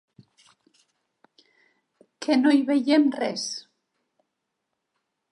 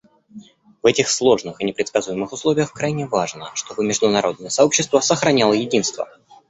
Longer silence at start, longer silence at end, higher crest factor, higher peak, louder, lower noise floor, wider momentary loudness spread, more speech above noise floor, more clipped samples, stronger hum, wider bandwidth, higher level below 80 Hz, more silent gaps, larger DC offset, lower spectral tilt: first, 2.2 s vs 0.35 s; first, 1.7 s vs 0.45 s; about the same, 18 dB vs 18 dB; second, -8 dBFS vs -2 dBFS; second, -23 LUFS vs -19 LUFS; first, -81 dBFS vs -43 dBFS; first, 13 LU vs 9 LU; first, 59 dB vs 24 dB; neither; neither; first, 11 kHz vs 8.4 kHz; second, -84 dBFS vs -58 dBFS; neither; neither; about the same, -3.5 dB/octave vs -3.5 dB/octave